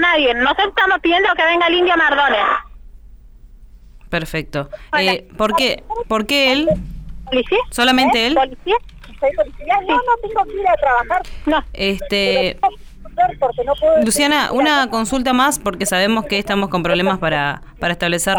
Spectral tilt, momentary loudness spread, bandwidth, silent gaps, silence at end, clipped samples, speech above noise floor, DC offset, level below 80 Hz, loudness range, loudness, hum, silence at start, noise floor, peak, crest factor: -3.5 dB/octave; 8 LU; 20 kHz; none; 0 s; under 0.1%; 24 dB; under 0.1%; -38 dBFS; 4 LU; -16 LUFS; none; 0 s; -40 dBFS; -4 dBFS; 14 dB